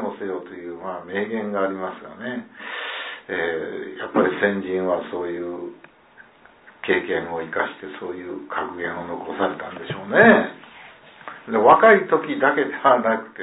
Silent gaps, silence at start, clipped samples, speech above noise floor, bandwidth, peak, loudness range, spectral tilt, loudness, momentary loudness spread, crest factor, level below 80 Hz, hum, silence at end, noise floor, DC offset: none; 0 s; under 0.1%; 29 dB; 4 kHz; -2 dBFS; 10 LU; -9.5 dB/octave; -21 LUFS; 18 LU; 20 dB; -64 dBFS; none; 0 s; -50 dBFS; under 0.1%